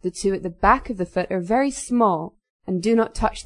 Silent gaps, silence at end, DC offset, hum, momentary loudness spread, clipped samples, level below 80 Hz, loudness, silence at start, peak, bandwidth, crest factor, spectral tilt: 2.50-2.59 s; 0.05 s; under 0.1%; none; 9 LU; under 0.1%; -40 dBFS; -22 LUFS; 0.05 s; -2 dBFS; 11 kHz; 20 dB; -5.5 dB/octave